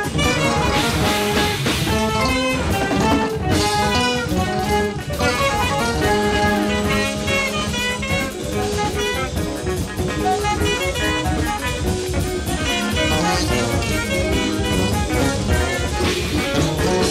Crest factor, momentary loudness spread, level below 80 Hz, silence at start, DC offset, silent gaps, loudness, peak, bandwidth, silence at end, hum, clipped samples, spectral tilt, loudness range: 14 dB; 4 LU; -30 dBFS; 0 s; under 0.1%; none; -19 LUFS; -4 dBFS; 16 kHz; 0 s; none; under 0.1%; -4.5 dB/octave; 3 LU